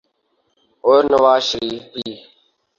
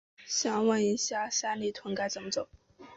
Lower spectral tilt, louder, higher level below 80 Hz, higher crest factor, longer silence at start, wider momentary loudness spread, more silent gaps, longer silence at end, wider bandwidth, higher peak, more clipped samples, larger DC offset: about the same, -3.5 dB/octave vs -2.5 dB/octave; first, -16 LUFS vs -31 LUFS; first, -56 dBFS vs -70 dBFS; about the same, 16 dB vs 16 dB; first, 0.85 s vs 0.2 s; first, 16 LU vs 8 LU; neither; first, 0.6 s vs 0 s; about the same, 7.4 kHz vs 8 kHz; first, -2 dBFS vs -16 dBFS; neither; neither